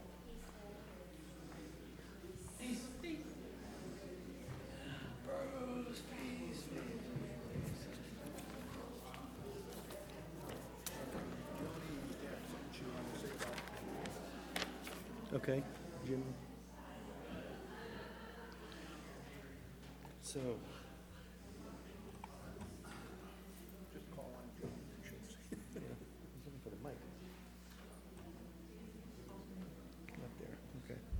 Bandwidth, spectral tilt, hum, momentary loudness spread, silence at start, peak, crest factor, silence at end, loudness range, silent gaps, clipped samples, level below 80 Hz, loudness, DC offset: over 20 kHz; -5 dB/octave; none; 10 LU; 0 s; -22 dBFS; 26 dB; 0 s; 8 LU; none; under 0.1%; -60 dBFS; -50 LUFS; under 0.1%